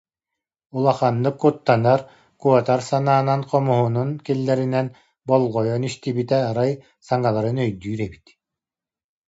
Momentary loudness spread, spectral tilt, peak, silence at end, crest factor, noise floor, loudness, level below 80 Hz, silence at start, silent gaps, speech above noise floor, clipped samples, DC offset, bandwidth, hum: 8 LU; -7.5 dB/octave; -2 dBFS; 1.1 s; 18 dB; under -90 dBFS; -21 LUFS; -58 dBFS; 0.75 s; none; over 70 dB; under 0.1%; under 0.1%; 8 kHz; none